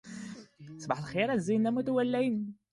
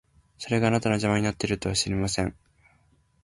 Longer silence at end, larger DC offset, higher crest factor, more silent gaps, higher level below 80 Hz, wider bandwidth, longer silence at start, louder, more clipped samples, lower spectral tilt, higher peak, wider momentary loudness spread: second, 0.2 s vs 0.9 s; neither; about the same, 18 dB vs 18 dB; neither; second, -70 dBFS vs -48 dBFS; about the same, 11.5 kHz vs 11.5 kHz; second, 0.05 s vs 0.4 s; second, -31 LUFS vs -26 LUFS; neither; first, -6.5 dB/octave vs -4.5 dB/octave; second, -14 dBFS vs -8 dBFS; first, 17 LU vs 6 LU